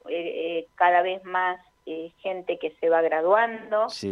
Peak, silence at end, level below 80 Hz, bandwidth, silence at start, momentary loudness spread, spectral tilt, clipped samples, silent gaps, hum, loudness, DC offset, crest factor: -8 dBFS; 0 s; -72 dBFS; 11 kHz; 0.05 s; 13 LU; -4.5 dB/octave; under 0.1%; none; none; -25 LUFS; under 0.1%; 18 dB